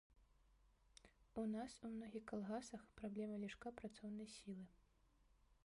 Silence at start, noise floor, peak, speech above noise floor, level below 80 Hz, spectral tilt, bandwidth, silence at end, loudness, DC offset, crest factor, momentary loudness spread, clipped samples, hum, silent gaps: 0.1 s; -77 dBFS; -36 dBFS; 26 dB; -74 dBFS; -5.5 dB/octave; 11.5 kHz; 0.1 s; -51 LUFS; under 0.1%; 18 dB; 11 LU; under 0.1%; none; none